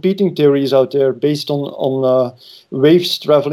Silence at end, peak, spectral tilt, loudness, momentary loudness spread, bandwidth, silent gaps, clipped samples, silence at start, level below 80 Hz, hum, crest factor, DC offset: 0 s; 0 dBFS; -6.5 dB/octave; -15 LUFS; 7 LU; 13.5 kHz; none; under 0.1%; 0.05 s; -66 dBFS; none; 14 dB; under 0.1%